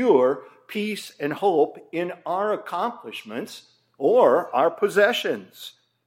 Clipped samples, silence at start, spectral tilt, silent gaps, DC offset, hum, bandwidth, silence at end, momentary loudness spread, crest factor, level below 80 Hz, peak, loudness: under 0.1%; 0 s; -4.5 dB/octave; none; under 0.1%; none; 16.5 kHz; 0.4 s; 16 LU; 18 dB; -84 dBFS; -4 dBFS; -23 LUFS